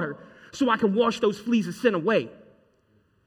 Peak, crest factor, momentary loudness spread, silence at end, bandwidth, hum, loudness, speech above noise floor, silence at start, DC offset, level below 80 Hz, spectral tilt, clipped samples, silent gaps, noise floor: -6 dBFS; 20 dB; 17 LU; 0.9 s; 14 kHz; none; -24 LUFS; 41 dB; 0 s; under 0.1%; -66 dBFS; -5.5 dB/octave; under 0.1%; none; -65 dBFS